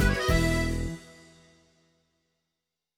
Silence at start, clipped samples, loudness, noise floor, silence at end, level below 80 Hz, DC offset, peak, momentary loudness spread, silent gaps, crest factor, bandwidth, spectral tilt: 0 s; under 0.1%; -27 LUFS; -86 dBFS; 1.95 s; -36 dBFS; under 0.1%; -10 dBFS; 13 LU; none; 20 dB; 18 kHz; -5 dB/octave